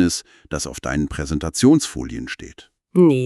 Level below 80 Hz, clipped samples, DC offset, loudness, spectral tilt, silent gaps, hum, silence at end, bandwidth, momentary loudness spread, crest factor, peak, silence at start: -38 dBFS; under 0.1%; under 0.1%; -20 LUFS; -5.5 dB/octave; none; none; 0 s; 13 kHz; 15 LU; 16 dB; -2 dBFS; 0 s